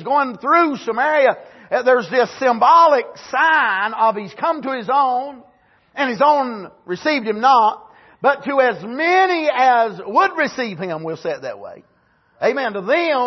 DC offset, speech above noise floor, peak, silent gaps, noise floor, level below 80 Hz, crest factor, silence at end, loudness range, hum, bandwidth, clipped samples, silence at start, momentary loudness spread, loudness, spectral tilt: under 0.1%; 37 dB; -2 dBFS; none; -54 dBFS; -70 dBFS; 14 dB; 0 s; 4 LU; none; 6.2 kHz; under 0.1%; 0 s; 11 LU; -17 LUFS; -4.5 dB/octave